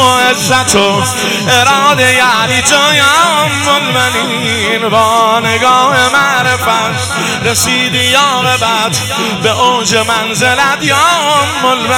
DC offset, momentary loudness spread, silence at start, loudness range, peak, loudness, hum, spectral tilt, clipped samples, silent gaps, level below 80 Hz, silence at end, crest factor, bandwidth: 0.1%; 5 LU; 0 s; 2 LU; 0 dBFS; -9 LUFS; none; -2.5 dB/octave; 0.3%; none; -46 dBFS; 0 s; 10 dB; 19 kHz